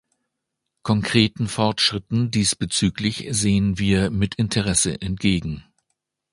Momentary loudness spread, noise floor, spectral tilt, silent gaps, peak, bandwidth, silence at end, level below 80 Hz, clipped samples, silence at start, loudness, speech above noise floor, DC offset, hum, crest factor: 5 LU; -80 dBFS; -4 dB/octave; none; 0 dBFS; 11.5 kHz; 0.7 s; -42 dBFS; under 0.1%; 0.85 s; -21 LUFS; 59 dB; under 0.1%; none; 22 dB